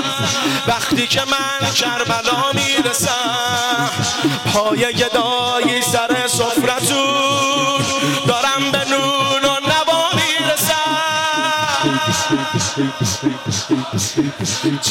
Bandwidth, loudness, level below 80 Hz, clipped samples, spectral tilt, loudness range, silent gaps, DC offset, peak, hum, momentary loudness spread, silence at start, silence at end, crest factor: 17 kHz; -16 LUFS; -52 dBFS; under 0.1%; -3 dB/octave; 2 LU; none; under 0.1%; -6 dBFS; none; 4 LU; 0 s; 0 s; 12 dB